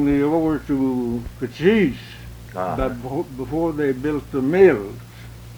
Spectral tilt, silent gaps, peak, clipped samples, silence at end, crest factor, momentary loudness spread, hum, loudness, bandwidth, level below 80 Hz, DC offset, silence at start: -7.5 dB/octave; none; -2 dBFS; under 0.1%; 0 s; 20 dB; 19 LU; 60 Hz at -45 dBFS; -21 LUFS; over 20 kHz; -40 dBFS; under 0.1%; 0 s